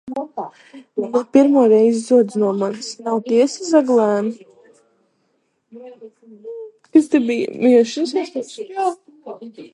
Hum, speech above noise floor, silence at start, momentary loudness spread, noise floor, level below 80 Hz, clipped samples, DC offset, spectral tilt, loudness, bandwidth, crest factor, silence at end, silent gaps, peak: none; 50 dB; 0.05 s; 22 LU; -67 dBFS; -72 dBFS; under 0.1%; under 0.1%; -5.5 dB/octave; -17 LUFS; 11 kHz; 18 dB; 0.05 s; none; 0 dBFS